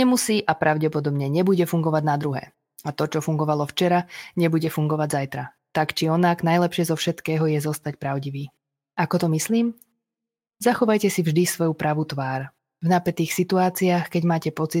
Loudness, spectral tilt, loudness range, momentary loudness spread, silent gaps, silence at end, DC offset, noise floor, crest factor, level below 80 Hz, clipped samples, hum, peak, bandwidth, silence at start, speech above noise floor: -23 LUFS; -5.5 dB/octave; 2 LU; 9 LU; none; 0 s; under 0.1%; -88 dBFS; 18 dB; -66 dBFS; under 0.1%; none; -4 dBFS; 17 kHz; 0 s; 66 dB